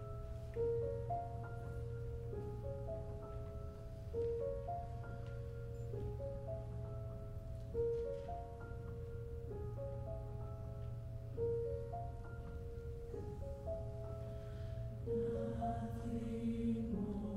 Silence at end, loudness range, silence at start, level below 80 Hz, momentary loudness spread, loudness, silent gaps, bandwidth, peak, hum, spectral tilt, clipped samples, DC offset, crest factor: 0 s; 3 LU; 0 s; -52 dBFS; 9 LU; -45 LUFS; none; 12.5 kHz; -28 dBFS; none; -9.5 dB/octave; under 0.1%; under 0.1%; 16 dB